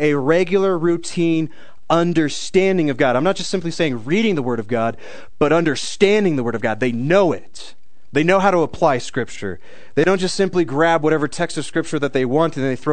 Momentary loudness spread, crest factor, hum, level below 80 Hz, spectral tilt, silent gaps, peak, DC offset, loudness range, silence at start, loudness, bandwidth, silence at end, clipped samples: 8 LU; 18 dB; none; -52 dBFS; -5.5 dB/octave; none; 0 dBFS; 3%; 1 LU; 0 s; -18 LUFS; 9.4 kHz; 0 s; under 0.1%